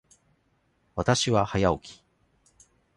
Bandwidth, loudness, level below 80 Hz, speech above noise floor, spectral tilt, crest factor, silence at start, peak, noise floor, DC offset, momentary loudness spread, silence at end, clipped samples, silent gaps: 11.5 kHz; -26 LUFS; -48 dBFS; 45 dB; -4.5 dB/octave; 22 dB; 0.95 s; -8 dBFS; -69 dBFS; under 0.1%; 14 LU; 1.05 s; under 0.1%; none